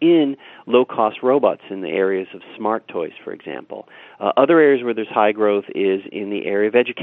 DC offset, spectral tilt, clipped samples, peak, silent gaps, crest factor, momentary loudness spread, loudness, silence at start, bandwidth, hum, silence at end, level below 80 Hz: under 0.1%; -9 dB/octave; under 0.1%; 0 dBFS; none; 18 dB; 17 LU; -19 LUFS; 0 s; 4 kHz; none; 0 s; -74 dBFS